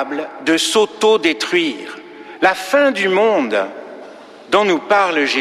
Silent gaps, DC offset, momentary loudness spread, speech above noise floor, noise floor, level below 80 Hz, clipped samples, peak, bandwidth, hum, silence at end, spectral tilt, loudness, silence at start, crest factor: none; under 0.1%; 18 LU; 22 dB; -37 dBFS; -64 dBFS; under 0.1%; -2 dBFS; 14.5 kHz; none; 0 s; -3 dB/octave; -15 LUFS; 0 s; 14 dB